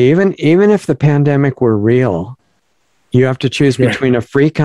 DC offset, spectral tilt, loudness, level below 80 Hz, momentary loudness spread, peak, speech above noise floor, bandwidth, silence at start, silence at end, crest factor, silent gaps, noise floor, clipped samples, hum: 0.3%; -7.5 dB/octave; -12 LUFS; -48 dBFS; 5 LU; 0 dBFS; 50 dB; 11.5 kHz; 0 s; 0 s; 12 dB; none; -62 dBFS; under 0.1%; none